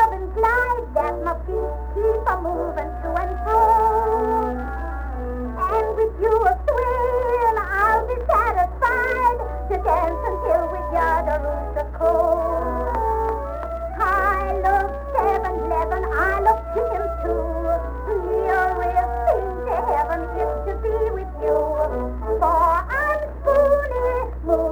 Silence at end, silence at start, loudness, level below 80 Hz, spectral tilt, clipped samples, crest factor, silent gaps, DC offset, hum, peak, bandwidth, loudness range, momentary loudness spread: 0 s; 0 s; -21 LUFS; -30 dBFS; -7.5 dB/octave; under 0.1%; 16 dB; none; under 0.1%; none; -6 dBFS; over 20 kHz; 2 LU; 8 LU